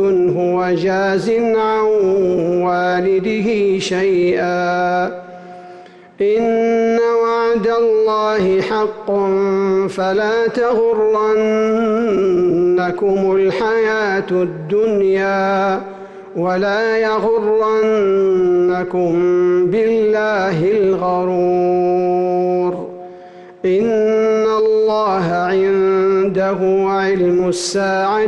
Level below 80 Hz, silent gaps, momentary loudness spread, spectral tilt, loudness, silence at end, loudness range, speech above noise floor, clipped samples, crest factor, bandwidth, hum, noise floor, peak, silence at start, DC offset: -52 dBFS; none; 4 LU; -6 dB/octave; -15 LUFS; 0 s; 2 LU; 24 dB; under 0.1%; 6 dB; 9.6 kHz; none; -39 dBFS; -8 dBFS; 0 s; under 0.1%